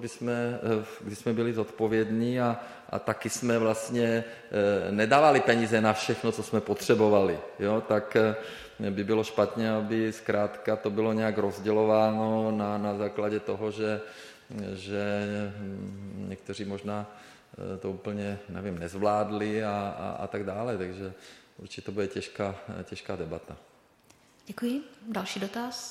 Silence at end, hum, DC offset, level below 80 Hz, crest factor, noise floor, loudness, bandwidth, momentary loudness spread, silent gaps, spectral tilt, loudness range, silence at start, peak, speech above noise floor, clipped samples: 0 s; none; under 0.1%; -64 dBFS; 22 dB; -61 dBFS; -29 LUFS; 15.5 kHz; 15 LU; none; -5.5 dB/octave; 12 LU; 0 s; -8 dBFS; 32 dB; under 0.1%